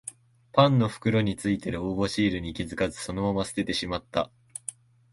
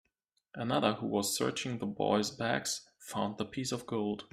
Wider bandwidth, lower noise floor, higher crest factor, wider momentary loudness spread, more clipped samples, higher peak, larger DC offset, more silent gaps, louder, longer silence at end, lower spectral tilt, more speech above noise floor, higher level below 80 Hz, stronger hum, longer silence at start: second, 11.5 kHz vs 15.5 kHz; second, -46 dBFS vs -81 dBFS; about the same, 22 dB vs 22 dB; first, 15 LU vs 7 LU; neither; first, -6 dBFS vs -12 dBFS; neither; neither; first, -27 LUFS vs -34 LUFS; first, 0.4 s vs 0.05 s; first, -5.5 dB/octave vs -4 dB/octave; second, 20 dB vs 47 dB; first, -50 dBFS vs -70 dBFS; neither; second, 0.05 s vs 0.55 s